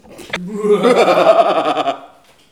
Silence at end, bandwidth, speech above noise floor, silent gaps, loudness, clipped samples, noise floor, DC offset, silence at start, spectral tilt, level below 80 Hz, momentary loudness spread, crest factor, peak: 0.45 s; 14.5 kHz; 32 dB; none; -13 LUFS; under 0.1%; -43 dBFS; 0.1%; 0.1 s; -5 dB/octave; -58 dBFS; 15 LU; 14 dB; 0 dBFS